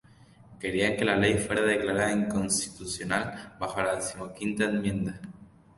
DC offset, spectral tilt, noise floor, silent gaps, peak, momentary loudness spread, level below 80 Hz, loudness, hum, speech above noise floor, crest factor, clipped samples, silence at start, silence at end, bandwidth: under 0.1%; -4 dB/octave; -55 dBFS; none; -10 dBFS; 11 LU; -54 dBFS; -28 LUFS; none; 27 dB; 20 dB; under 0.1%; 0.5 s; 0.3 s; 12 kHz